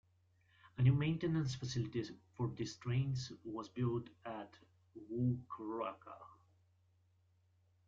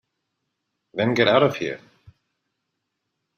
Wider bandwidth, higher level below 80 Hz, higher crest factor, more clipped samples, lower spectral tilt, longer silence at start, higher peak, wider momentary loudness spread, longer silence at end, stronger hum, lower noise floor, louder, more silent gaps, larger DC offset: second, 7.6 kHz vs 15 kHz; about the same, -68 dBFS vs -66 dBFS; about the same, 20 dB vs 22 dB; neither; about the same, -7 dB/octave vs -6 dB/octave; second, 0.65 s vs 0.95 s; second, -20 dBFS vs -4 dBFS; about the same, 18 LU vs 17 LU; about the same, 1.55 s vs 1.6 s; neither; second, -74 dBFS vs -79 dBFS; second, -40 LUFS vs -21 LUFS; neither; neither